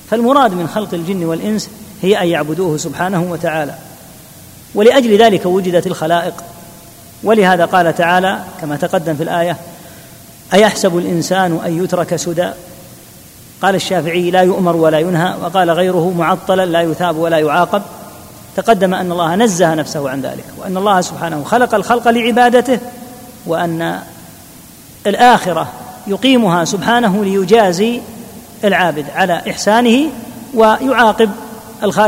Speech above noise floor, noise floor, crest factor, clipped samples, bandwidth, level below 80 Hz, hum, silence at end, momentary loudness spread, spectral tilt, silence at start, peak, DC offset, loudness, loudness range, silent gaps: 25 dB; -38 dBFS; 14 dB; 0.1%; 16.5 kHz; -50 dBFS; none; 0 s; 14 LU; -5 dB/octave; 0.05 s; 0 dBFS; under 0.1%; -13 LUFS; 3 LU; none